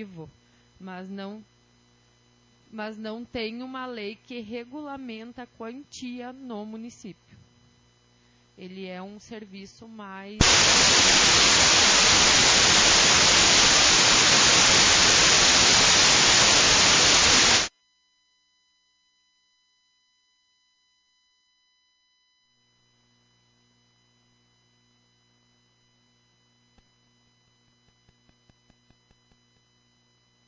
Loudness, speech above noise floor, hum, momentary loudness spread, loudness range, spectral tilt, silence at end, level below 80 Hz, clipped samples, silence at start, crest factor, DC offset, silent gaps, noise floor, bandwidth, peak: -16 LUFS; 42 dB; 60 Hz at -60 dBFS; 24 LU; 24 LU; -0.5 dB/octave; 12.8 s; -46 dBFS; under 0.1%; 0 s; 20 dB; under 0.1%; none; -69 dBFS; 7.8 kHz; -6 dBFS